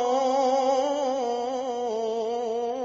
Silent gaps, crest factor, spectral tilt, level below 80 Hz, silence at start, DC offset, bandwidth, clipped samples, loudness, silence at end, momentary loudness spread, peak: none; 14 dB; -2 dB/octave; -72 dBFS; 0 s; under 0.1%; 7.6 kHz; under 0.1%; -26 LUFS; 0 s; 6 LU; -12 dBFS